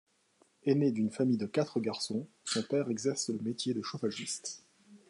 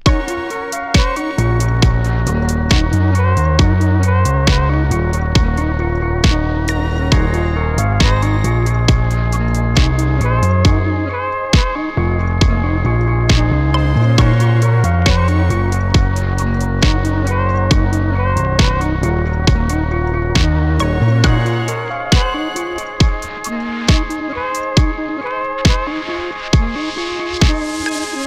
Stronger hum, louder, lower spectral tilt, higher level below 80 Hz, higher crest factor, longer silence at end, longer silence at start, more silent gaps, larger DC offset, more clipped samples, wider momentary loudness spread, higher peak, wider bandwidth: neither; second, -33 LUFS vs -16 LUFS; about the same, -5 dB/octave vs -5.5 dB/octave; second, -78 dBFS vs -20 dBFS; about the same, 18 dB vs 14 dB; first, 0.15 s vs 0 s; first, 0.65 s vs 0 s; neither; neither; neither; about the same, 8 LU vs 7 LU; second, -16 dBFS vs -2 dBFS; second, 11.5 kHz vs 14.5 kHz